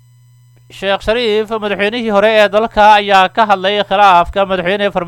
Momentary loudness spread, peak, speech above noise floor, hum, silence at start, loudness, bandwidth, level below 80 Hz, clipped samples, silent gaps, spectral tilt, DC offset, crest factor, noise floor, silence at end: 8 LU; 0 dBFS; 34 dB; none; 0.75 s; -11 LUFS; 17 kHz; -38 dBFS; under 0.1%; none; -4.5 dB/octave; under 0.1%; 12 dB; -45 dBFS; 0 s